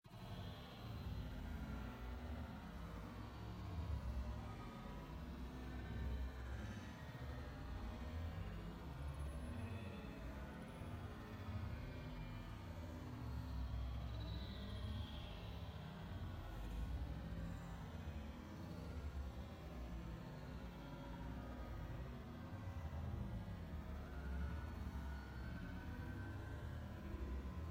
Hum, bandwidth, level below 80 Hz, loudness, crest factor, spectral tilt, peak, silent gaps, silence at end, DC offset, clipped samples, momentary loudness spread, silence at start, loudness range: none; 16.5 kHz; -52 dBFS; -51 LUFS; 14 dB; -7 dB/octave; -34 dBFS; none; 0 s; under 0.1%; under 0.1%; 5 LU; 0.05 s; 2 LU